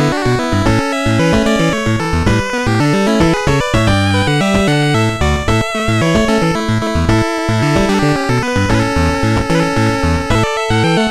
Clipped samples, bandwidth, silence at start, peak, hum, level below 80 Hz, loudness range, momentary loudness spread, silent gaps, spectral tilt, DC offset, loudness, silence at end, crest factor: under 0.1%; 14.5 kHz; 0 s; 0 dBFS; none; -26 dBFS; 1 LU; 3 LU; none; -5.5 dB/octave; 1%; -13 LUFS; 0 s; 12 dB